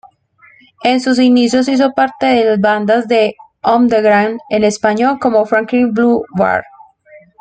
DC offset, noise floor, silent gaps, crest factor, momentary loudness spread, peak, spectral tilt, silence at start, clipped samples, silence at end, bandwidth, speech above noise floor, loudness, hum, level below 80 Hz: under 0.1%; -48 dBFS; none; 12 dB; 5 LU; -2 dBFS; -5 dB/octave; 0.8 s; under 0.1%; 0.25 s; 9.2 kHz; 36 dB; -13 LUFS; none; -54 dBFS